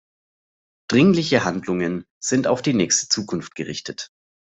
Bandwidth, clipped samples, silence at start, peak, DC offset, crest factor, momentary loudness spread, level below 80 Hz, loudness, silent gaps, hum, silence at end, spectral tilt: 8.2 kHz; under 0.1%; 0.9 s; -2 dBFS; under 0.1%; 20 dB; 14 LU; -60 dBFS; -21 LUFS; 2.11-2.21 s; none; 0.5 s; -4 dB/octave